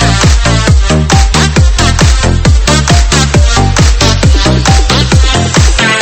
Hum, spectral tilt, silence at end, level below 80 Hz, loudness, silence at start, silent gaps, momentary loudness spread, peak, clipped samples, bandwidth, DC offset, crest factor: none; -4 dB/octave; 0 s; -10 dBFS; -7 LUFS; 0 s; none; 1 LU; 0 dBFS; 2%; 11.5 kHz; under 0.1%; 6 dB